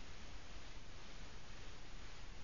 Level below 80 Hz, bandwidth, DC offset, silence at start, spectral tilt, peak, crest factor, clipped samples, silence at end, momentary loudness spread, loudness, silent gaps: -56 dBFS; 7.2 kHz; 0.4%; 0 s; -3 dB/octave; -38 dBFS; 12 dB; under 0.1%; 0 s; 1 LU; -56 LUFS; none